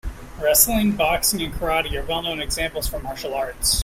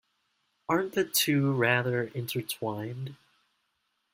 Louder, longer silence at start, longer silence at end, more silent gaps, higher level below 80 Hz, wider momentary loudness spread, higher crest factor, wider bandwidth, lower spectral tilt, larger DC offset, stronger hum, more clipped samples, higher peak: first, -21 LUFS vs -28 LUFS; second, 0.05 s vs 0.7 s; second, 0 s vs 1 s; neither; first, -34 dBFS vs -70 dBFS; about the same, 12 LU vs 14 LU; about the same, 22 dB vs 22 dB; about the same, 16.5 kHz vs 16.5 kHz; second, -2.5 dB/octave vs -4.5 dB/octave; neither; neither; neither; first, 0 dBFS vs -8 dBFS